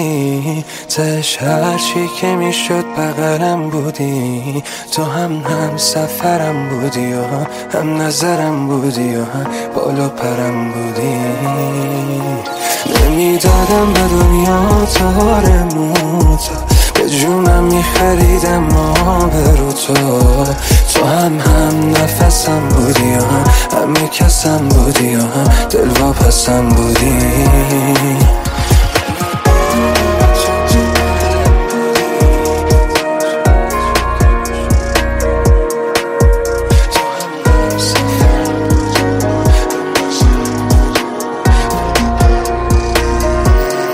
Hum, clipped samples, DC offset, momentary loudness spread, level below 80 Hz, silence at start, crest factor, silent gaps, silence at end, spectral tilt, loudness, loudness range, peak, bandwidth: none; under 0.1%; under 0.1%; 7 LU; -16 dBFS; 0 s; 12 dB; none; 0 s; -5 dB/octave; -13 LUFS; 5 LU; 0 dBFS; 16.5 kHz